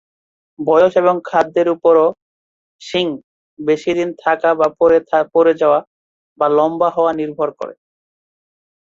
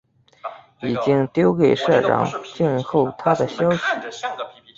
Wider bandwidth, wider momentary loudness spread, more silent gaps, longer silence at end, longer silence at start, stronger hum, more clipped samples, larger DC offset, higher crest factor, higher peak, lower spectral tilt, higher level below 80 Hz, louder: about the same, 7.4 kHz vs 7.8 kHz; second, 10 LU vs 15 LU; first, 2.22-2.79 s, 3.24-3.57 s, 5.87-6.36 s vs none; first, 1.1 s vs 0.25 s; first, 0.6 s vs 0.45 s; neither; neither; neither; about the same, 14 dB vs 18 dB; about the same, -2 dBFS vs -2 dBFS; about the same, -6 dB/octave vs -6.5 dB/octave; about the same, -58 dBFS vs -58 dBFS; first, -15 LUFS vs -20 LUFS